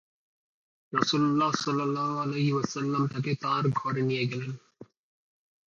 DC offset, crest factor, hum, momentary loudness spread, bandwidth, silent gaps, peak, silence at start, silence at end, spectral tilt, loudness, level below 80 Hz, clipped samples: under 0.1%; 22 dB; none; 7 LU; 7.6 kHz; none; -6 dBFS; 0.9 s; 0.8 s; -6 dB/octave; -28 LUFS; -70 dBFS; under 0.1%